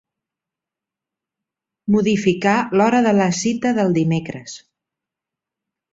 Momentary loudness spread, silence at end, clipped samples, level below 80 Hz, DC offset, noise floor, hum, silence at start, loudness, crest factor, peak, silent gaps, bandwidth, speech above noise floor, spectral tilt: 16 LU; 1.35 s; under 0.1%; -58 dBFS; under 0.1%; -87 dBFS; none; 1.85 s; -17 LUFS; 18 dB; -2 dBFS; none; 7.8 kHz; 70 dB; -5.5 dB/octave